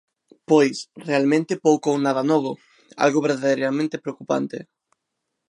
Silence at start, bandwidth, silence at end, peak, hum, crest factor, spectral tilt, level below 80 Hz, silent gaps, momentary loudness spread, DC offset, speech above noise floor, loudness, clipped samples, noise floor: 0.5 s; 11.5 kHz; 0.85 s; -4 dBFS; none; 18 dB; -5.5 dB/octave; -76 dBFS; none; 13 LU; under 0.1%; 58 dB; -21 LUFS; under 0.1%; -79 dBFS